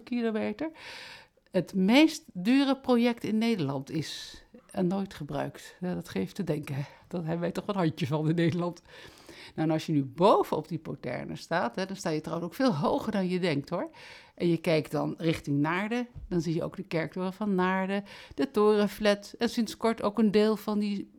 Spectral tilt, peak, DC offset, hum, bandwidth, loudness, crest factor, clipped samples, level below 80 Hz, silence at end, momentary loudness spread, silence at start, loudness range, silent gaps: -6.5 dB/octave; -10 dBFS; under 0.1%; none; 17 kHz; -29 LUFS; 20 dB; under 0.1%; -60 dBFS; 0.15 s; 13 LU; 0 s; 6 LU; none